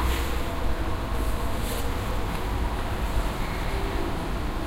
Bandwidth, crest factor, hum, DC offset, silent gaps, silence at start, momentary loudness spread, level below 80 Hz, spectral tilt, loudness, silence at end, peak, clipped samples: 16 kHz; 12 dB; none; under 0.1%; none; 0 s; 1 LU; -28 dBFS; -5.5 dB/octave; -30 LUFS; 0 s; -14 dBFS; under 0.1%